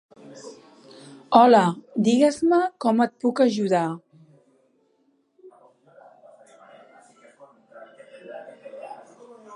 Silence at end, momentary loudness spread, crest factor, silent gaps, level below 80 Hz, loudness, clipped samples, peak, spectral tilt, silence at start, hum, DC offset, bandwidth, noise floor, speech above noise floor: 0 s; 26 LU; 24 dB; none; -74 dBFS; -20 LUFS; under 0.1%; 0 dBFS; -6 dB/octave; 0.35 s; none; under 0.1%; 11 kHz; -66 dBFS; 47 dB